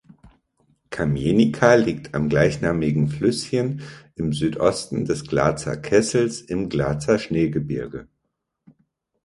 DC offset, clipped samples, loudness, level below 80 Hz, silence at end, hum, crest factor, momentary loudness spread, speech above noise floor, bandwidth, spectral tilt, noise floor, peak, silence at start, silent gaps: under 0.1%; under 0.1%; -21 LUFS; -46 dBFS; 1.2 s; none; 22 dB; 11 LU; 56 dB; 11.5 kHz; -6 dB/octave; -77 dBFS; 0 dBFS; 0.25 s; none